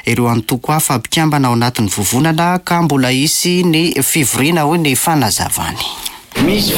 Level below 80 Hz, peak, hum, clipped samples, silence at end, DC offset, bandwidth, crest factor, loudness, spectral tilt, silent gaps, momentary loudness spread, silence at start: -40 dBFS; -2 dBFS; none; under 0.1%; 0 s; under 0.1%; 17 kHz; 12 dB; -13 LUFS; -4 dB/octave; none; 5 LU; 0.05 s